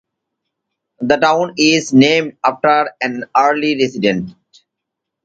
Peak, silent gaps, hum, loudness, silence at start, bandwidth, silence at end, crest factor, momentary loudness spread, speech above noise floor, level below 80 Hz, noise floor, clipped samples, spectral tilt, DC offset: 0 dBFS; none; none; -14 LUFS; 1 s; 9 kHz; 0.95 s; 16 dB; 10 LU; 65 dB; -58 dBFS; -79 dBFS; under 0.1%; -4.5 dB/octave; under 0.1%